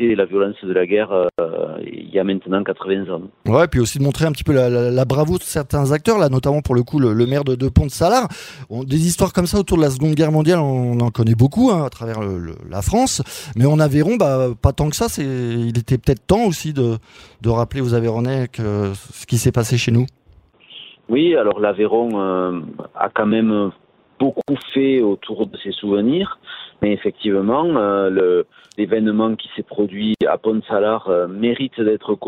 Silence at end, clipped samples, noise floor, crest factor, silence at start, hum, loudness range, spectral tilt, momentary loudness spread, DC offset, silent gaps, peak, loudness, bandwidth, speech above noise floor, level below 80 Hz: 0 s; under 0.1%; -50 dBFS; 18 dB; 0 s; none; 3 LU; -6.5 dB/octave; 10 LU; under 0.1%; none; 0 dBFS; -18 LUFS; 16 kHz; 33 dB; -38 dBFS